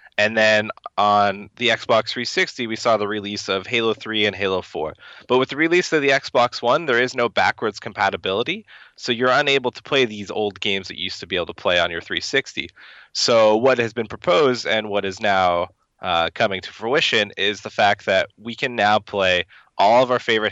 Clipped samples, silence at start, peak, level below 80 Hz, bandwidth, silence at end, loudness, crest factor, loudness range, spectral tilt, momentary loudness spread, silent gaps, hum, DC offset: under 0.1%; 0.2 s; -4 dBFS; -60 dBFS; 8.2 kHz; 0 s; -20 LUFS; 16 dB; 2 LU; -3.5 dB/octave; 9 LU; none; none; under 0.1%